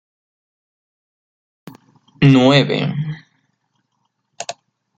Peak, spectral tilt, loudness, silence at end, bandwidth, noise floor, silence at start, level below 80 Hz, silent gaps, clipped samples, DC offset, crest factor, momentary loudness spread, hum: -2 dBFS; -6.5 dB/octave; -14 LUFS; 0.45 s; 8.8 kHz; -70 dBFS; 2.2 s; -54 dBFS; none; under 0.1%; under 0.1%; 18 dB; 20 LU; none